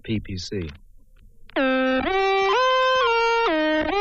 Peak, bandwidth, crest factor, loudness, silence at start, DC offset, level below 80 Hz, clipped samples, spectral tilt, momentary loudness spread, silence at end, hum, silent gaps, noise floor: -10 dBFS; 8 kHz; 12 dB; -21 LUFS; 0.05 s; under 0.1%; -46 dBFS; under 0.1%; -4.5 dB/octave; 12 LU; 0 s; none; none; -48 dBFS